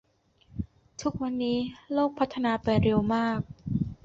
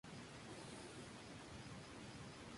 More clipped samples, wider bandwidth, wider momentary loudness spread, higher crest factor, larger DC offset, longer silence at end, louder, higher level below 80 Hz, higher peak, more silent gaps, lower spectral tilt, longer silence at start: neither; second, 7.6 kHz vs 11.5 kHz; first, 15 LU vs 1 LU; about the same, 18 dB vs 14 dB; neither; about the same, 0.1 s vs 0 s; first, -28 LUFS vs -55 LUFS; first, -48 dBFS vs -70 dBFS; first, -10 dBFS vs -40 dBFS; neither; first, -7 dB/octave vs -4 dB/octave; first, 0.55 s vs 0.05 s